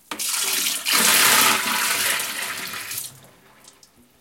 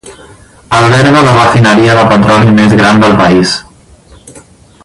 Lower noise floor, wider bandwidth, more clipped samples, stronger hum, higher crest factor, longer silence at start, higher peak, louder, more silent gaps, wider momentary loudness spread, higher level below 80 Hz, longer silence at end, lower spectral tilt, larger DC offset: first, -54 dBFS vs -38 dBFS; first, 17 kHz vs 11.5 kHz; second, under 0.1% vs 0.8%; neither; first, 22 dB vs 8 dB; about the same, 0.1 s vs 0.05 s; about the same, 0 dBFS vs 0 dBFS; second, -18 LUFS vs -6 LUFS; neither; first, 15 LU vs 4 LU; second, -72 dBFS vs -34 dBFS; first, 1.1 s vs 0.45 s; second, 1 dB/octave vs -6 dB/octave; neither